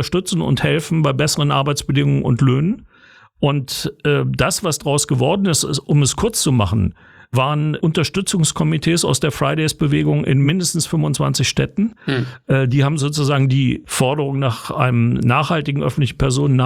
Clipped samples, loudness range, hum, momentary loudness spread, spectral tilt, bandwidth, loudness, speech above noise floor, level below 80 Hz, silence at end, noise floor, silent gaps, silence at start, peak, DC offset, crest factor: under 0.1%; 1 LU; none; 5 LU; -5 dB/octave; 15.5 kHz; -17 LUFS; 31 dB; -40 dBFS; 0 s; -48 dBFS; none; 0 s; 0 dBFS; under 0.1%; 16 dB